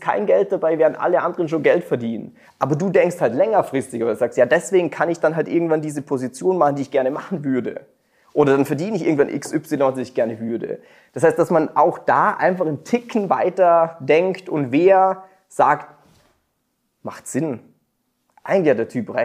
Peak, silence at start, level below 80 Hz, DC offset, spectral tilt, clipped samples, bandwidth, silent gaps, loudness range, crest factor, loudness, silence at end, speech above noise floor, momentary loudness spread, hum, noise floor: -2 dBFS; 0 s; -68 dBFS; under 0.1%; -6.5 dB/octave; under 0.1%; 15 kHz; none; 4 LU; 18 dB; -19 LUFS; 0 s; 52 dB; 10 LU; none; -71 dBFS